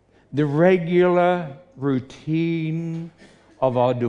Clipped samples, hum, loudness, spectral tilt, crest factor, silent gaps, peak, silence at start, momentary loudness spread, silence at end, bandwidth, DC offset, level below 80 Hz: under 0.1%; none; -21 LUFS; -8.5 dB/octave; 16 dB; none; -4 dBFS; 0.3 s; 13 LU; 0 s; 7.4 kHz; under 0.1%; -62 dBFS